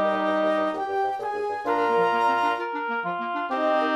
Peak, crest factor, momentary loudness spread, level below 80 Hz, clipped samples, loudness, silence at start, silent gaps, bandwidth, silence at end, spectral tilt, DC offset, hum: -10 dBFS; 14 dB; 6 LU; -68 dBFS; under 0.1%; -25 LUFS; 0 s; none; 13 kHz; 0 s; -5.5 dB/octave; under 0.1%; none